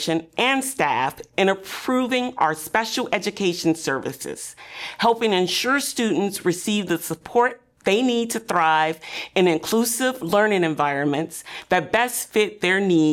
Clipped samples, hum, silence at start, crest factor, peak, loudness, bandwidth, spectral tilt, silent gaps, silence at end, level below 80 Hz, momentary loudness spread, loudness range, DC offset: under 0.1%; none; 0 s; 14 dB; -8 dBFS; -22 LUFS; 17.5 kHz; -3.5 dB/octave; none; 0 s; -62 dBFS; 8 LU; 2 LU; under 0.1%